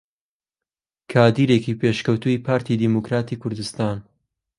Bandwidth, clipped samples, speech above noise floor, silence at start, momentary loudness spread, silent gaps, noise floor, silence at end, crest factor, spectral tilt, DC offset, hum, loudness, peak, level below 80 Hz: 11.5 kHz; under 0.1%; over 70 dB; 1.1 s; 11 LU; none; under -90 dBFS; 0.6 s; 20 dB; -7 dB/octave; under 0.1%; none; -21 LUFS; 0 dBFS; -56 dBFS